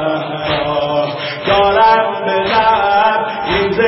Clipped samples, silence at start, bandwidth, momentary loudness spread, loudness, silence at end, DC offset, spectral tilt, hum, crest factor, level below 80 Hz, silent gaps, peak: under 0.1%; 0 s; 5.8 kHz; 8 LU; -14 LUFS; 0 s; under 0.1%; -9 dB/octave; none; 12 dB; -40 dBFS; none; 0 dBFS